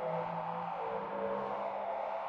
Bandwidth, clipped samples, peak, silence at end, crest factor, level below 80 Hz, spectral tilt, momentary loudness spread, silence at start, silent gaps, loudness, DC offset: 7.2 kHz; under 0.1%; -24 dBFS; 0 s; 12 dB; -74 dBFS; -7.5 dB/octave; 2 LU; 0 s; none; -38 LUFS; under 0.1%